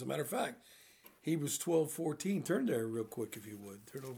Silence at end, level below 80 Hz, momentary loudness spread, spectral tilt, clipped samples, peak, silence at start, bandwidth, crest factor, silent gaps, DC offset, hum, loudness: 0 s; -82 dBFS; 15 LU; -5 dB/octave; under 0.1%; -20 dBFS; 0 s; over 20 kHz; 18 dB; none; under 0.1%; none; -37 LUFS